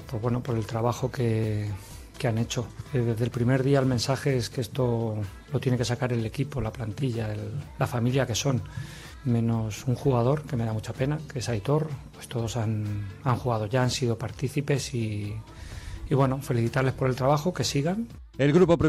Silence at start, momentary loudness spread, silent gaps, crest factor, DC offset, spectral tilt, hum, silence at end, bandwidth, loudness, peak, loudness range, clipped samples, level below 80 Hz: 0 s; 10 LU; none; 16 dB; under 0.1%; -6 dB/octave; none; 0 s; 13.5 kHz; -27 LUFS; -10 dBFS; 3 LU; under 0.1%; -48 dBFS